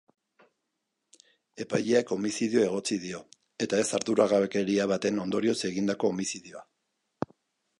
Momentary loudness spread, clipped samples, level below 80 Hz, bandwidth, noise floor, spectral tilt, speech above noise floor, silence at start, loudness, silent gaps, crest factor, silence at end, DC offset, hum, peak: 14 LU; under 0.1%; -70 dBFS; 11.5 kHz; -82 dBFS; -4.5 dB/octave; 54 dB; 1.55 s; -28 LUFS; none; 20 dB; 1.15 s; under 0.1%; none; -10 dBFS